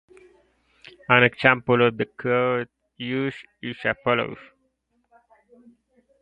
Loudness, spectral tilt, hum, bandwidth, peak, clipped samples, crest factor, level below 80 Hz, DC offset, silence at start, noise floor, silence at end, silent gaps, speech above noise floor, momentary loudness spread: -22 LUFS; -7.5 dB/octave; none; 5.2 kHz; 0 dBFS; under 0.1%; 24 dB; -62 dBFS; under 0.1%; 1.1 s; -71 dBFS; 1.8 s; none; 48 dB; 18 LU